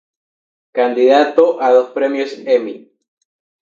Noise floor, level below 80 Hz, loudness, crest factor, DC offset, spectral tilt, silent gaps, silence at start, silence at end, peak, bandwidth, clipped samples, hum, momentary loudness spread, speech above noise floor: under -90 dBFS; -74 dBFS; -14 LUFS; 16 dB; under 0.1%; -4.5 dB/octave; none; 0.75 s; 0.85 s; 0 dBFS; 7.2 kHz; under 0.1%; none; 13 LU; over 77 dB